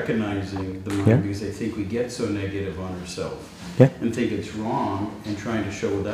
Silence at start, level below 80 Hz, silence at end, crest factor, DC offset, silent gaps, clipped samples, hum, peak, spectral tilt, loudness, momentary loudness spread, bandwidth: 0 s; -50 dBFS; 0 s; 24 dB; under 0.1%; none; under 0.1%; none; 0 dBFS; -7 dB/octave; -25 LUFS; 12 LU; 15 kHz